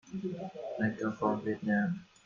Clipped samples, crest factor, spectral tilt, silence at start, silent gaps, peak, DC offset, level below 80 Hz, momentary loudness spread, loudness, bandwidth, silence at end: under 0.1%; 20 dB; -8 dB/octave; 0.05 s; none; -14 dBFS; under 0.1%; -70 dBFS; 9 LU; -34 LUFS; 7.4 kHz; 0.2 s